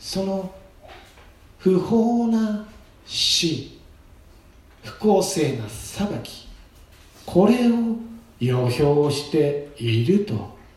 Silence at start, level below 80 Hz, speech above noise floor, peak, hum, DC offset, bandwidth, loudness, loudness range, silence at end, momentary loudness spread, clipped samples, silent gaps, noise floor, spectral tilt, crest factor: 0 s; -50 dBFS; 29 dB; -4 dBFS; none; under 0.1%; 15 kHz; -22 LUFS; 5 LU; 0.2 s; 14 LU; under 0.1%; none; -49 dBFS; -5.5 dB/octave; 18 dB